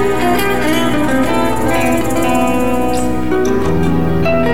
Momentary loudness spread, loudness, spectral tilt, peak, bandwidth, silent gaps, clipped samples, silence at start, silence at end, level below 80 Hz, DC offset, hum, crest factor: 2 LU; -14 LUFS; -5.5 dB/octave; -4 dBFS; 17 kHz; none; under 0.1%; 0 s; 0 s; -30 dBFS; 10%; none; 12 dB